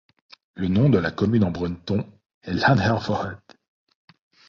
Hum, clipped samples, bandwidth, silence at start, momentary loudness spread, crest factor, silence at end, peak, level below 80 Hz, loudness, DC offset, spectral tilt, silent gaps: none; under 0.1%; 7.2 kHz; 0.55 s; 15 LU; 18 dB; 1.15 s; -6 dBFS; -46 dBFS; -22 LUFS; under 0.1%; -7.5 dB/octave; 2.26-2.41 s